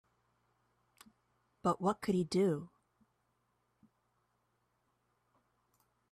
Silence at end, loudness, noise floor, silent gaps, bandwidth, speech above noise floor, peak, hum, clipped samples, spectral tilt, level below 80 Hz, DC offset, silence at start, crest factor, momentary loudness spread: 3.45 s; -35 LUFS; -80 dBFS; none; 13.5 kHz; 46 dB; -20 dBFS; none; under 0.1%; -6.5 dB/octave; -74 dBFS; under 0.1%; 1.65 s; 20 dB; 5 LU